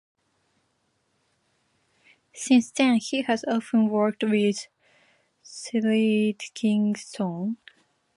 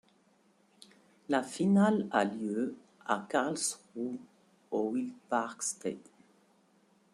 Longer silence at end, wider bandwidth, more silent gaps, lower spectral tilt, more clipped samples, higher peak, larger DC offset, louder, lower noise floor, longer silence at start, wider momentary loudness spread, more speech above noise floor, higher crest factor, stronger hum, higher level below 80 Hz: second, 0.6 s vs 1.15 s; second, 11.5 kHz vs 13 kHz; neither; about the same, -5 dB/octave vs -5 dB/octave; neither; first, -6 dBFS vs -12 dBFS; neither; first, -24 LUFS vs -33 LUFS; first, -72 dBFS vs -68 dBFS; first, 2.35 s vs 1.3 s; about the same, 13 LU vs 13 LU; first, 48 dB vs 36 dB; about the same, 20 dB vs 22 dB; neither; about the same, -76 dBFS vs -80 dBFS